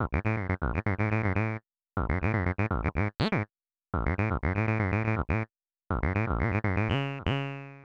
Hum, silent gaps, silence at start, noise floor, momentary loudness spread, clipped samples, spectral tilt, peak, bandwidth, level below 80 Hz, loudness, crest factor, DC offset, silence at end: none; none; 0 s; -53 dBFS; 6 LU; under 0.1%; -8.5 dB/octave; -14 dBFS; 6.4 kHz; -40 dBFS; -30 LUFS; 16 dB; under 0.1%; 0 s